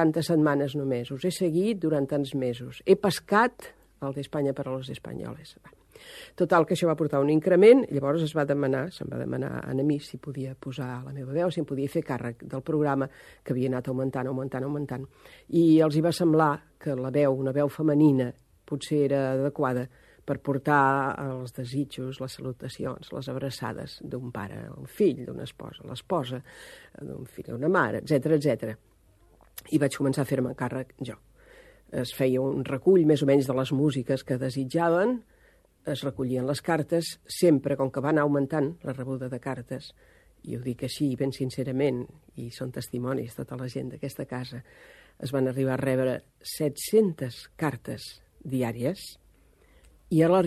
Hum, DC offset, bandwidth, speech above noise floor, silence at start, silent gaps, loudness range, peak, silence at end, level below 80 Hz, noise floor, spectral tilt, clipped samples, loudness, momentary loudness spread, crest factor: none; under 0.1%; 13.5 kHz; 34 dB; 0 s; none; 9 LU; -6 dBFS; 0 s; -60 dBFS; -61 dBFS; -6.5 dB/octave; under 0.1%; -27 LUFS; 16 LU; 22 dB